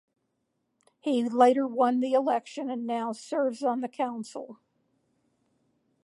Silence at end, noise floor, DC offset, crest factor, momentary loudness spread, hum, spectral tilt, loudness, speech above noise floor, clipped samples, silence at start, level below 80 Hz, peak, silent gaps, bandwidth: 1.5 s; -78 dBFS; under 0.1%; 20 dB; 15 LU; none; -5 dB/octave; -27 LUFS; 51 dB; under 0.1%; 1.05 s; -86 dBFS; -8 dBFS; none; 11.5 kHz